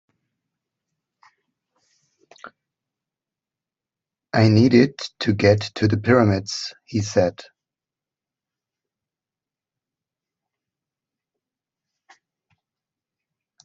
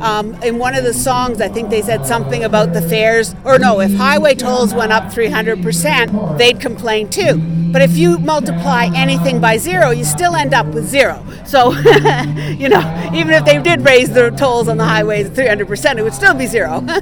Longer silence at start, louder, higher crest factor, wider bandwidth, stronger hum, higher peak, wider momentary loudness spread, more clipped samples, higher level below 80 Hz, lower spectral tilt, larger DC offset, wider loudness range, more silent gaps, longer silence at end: first, 2.45 s vs 0 s; second, -19 LUFS vs -12 LUFS; first, 22 dB vs 12 dB; second, 7.8 kHz vs over 20 kHz; neither; about the same, -2 dBFS vs 0 dBFS; first, 12 LU vs 7 LU; second, under 0.1% vs 0.5%; second, -60 dBFS vs -36 dBFS; first, -6.5 dB/octave vs -4.5 dB/octave; second, under 0.1% vs 0.7%; first, 10 LU vs 3 LU; neither; first, 6.25 s vs 0 s